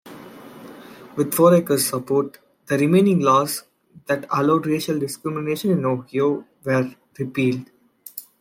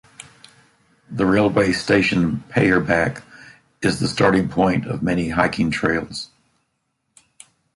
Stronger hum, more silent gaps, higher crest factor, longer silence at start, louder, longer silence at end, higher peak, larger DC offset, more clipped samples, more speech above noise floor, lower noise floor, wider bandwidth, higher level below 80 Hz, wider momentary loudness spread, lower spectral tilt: neither; neither; about the same, 18 dB vs 18 dB; second, 0.05 s vs 1.1 s; about the same, -21 LUFS vs -19 LUFS; second, 0.2 s vs 1.5 s; about the same, -2 dBFS vs -2 dBFS; neither; neither; second, 22 dB vs 54 dB; second, -41 dBFS vs -72 dBFS; first, 16.5 kHz vs 11.5 kHz; second, -66 dBFS vs -46 dBFS; first, 25 LU vs 8 LU; about the same, -5.5 dB/octave vs -6 dB/octave